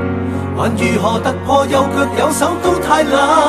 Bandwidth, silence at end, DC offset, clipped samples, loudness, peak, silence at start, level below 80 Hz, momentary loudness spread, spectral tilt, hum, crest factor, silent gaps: 14 kHz; 0 s; under 0.1%; under 0.1%; -14 LUFS; 0 dBFS; 0 s; -40 dBFS; 6 LU; -5 dB/octave; none; 14 dB; none